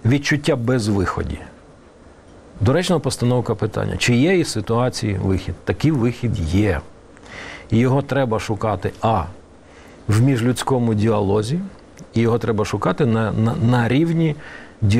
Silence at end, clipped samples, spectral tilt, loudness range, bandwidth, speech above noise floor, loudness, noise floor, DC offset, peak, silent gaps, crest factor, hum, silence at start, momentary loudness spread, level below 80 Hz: 0 s; under 0.1%; -6.5 dB/octave; 2 LU; 14.5 kHz; 27 dB; -19 LUFS; -45 dBFS; 0.2%; -4 dBFS; none; 16 dB; none; 0.05 s; 9 LU; -40 dBFS